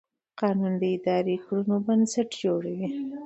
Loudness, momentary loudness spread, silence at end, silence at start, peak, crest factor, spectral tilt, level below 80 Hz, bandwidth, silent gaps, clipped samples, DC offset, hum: -27 LUFS; 6 LU; 0 s; 0.35 s; -10 dBFS; 16 dB; -6.5 dB/octave; -72 dBFS; 8.8 kHz; none; under 0.1%; under 0.1%; none